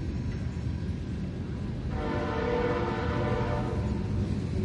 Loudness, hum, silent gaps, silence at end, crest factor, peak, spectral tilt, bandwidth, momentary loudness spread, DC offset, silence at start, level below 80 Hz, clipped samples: -31 LUFS; none; none; 0 s; 14 dB; -16 dBFS; -8 dB/octave; 10.5 kHz; 6 LU; under 0.1%; 0 s; -38 dBFS; under 0.1%